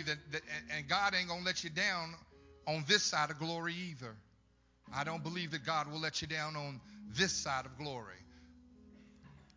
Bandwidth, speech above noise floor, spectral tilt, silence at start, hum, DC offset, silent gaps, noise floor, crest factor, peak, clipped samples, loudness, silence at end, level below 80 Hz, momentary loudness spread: 7.6 kHz; 32 dB; -2.5 dB/octave; 0 s; none; under 0.1%; none; -70 dBFS; 24 dB; -14 dBFS; under 0.1%; -36 LUFS; 0.15 s; -66 dBFS; 15 LU